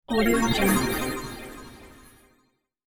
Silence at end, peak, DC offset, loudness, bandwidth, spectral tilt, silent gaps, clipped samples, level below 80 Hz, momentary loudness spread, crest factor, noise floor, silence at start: 0.65 s; -10 dBFS; under 0.1%; -24 LUFS; 18.5 kHz; -4 dB/octave; none; under 0.1%; -42 dBFS; 21 LU; 18 dB; -69 dBFS; 0.1 s